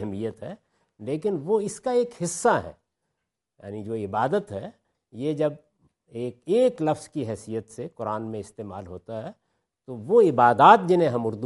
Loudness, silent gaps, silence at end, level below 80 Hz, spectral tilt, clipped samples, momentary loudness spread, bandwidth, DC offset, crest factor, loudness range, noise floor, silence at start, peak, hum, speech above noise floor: -23 LUFS; none; 0 s; -66 dBFS; -5.5 dB/octave; under 0.1%; 21 LU; 11.5 kHz; under 0.1%; 22 dB; 9 LU; -82 dBFS; 0 s; -2 dBFS; none; 58 dB